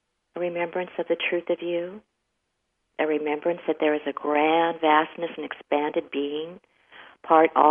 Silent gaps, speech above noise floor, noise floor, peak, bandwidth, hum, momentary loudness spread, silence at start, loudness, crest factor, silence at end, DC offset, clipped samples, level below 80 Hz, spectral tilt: none; 53 dB; -77 dBFS; -4 dBFS; 3.7 kHz; none; 13 LU; 0.35 s; -25 LUFS; 22 dB; 0 s; under 0.1%; under 0.1%; -76 dBFS; -8 dB/octave